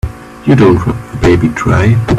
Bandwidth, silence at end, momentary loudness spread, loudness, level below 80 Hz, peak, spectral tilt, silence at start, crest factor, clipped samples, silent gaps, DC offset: 13 kHz; 0 s; 11 LU; -10 LUFS; -26 dBFS; 0 dBFS; -8 dB/octave; 0.05 s; 10 dB; under 0.1%; none; under 0.1%